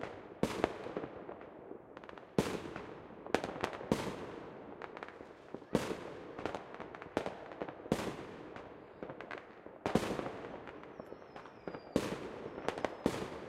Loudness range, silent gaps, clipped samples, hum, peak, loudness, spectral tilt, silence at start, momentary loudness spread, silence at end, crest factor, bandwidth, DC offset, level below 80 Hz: 3 LU; none; under 0.1%; none; -10 dBFS; -41 LUFS; -5.5 dB/octave; 0 s; 14 LU; 0 s; 32 dB; 16 kHz; under 0.1%; -62 dBFS